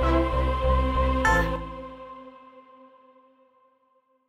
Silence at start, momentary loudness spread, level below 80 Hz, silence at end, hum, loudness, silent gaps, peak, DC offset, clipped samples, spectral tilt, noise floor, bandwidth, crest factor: 0 s; 21 LU; -30 dBFS; 1.7 s; none; -24 LUFS; none; -10 dBFS; under 0.1%; under 0.1%; -6.5 dB/octave; -67 dBFS; 11.5 kHz; 18 dB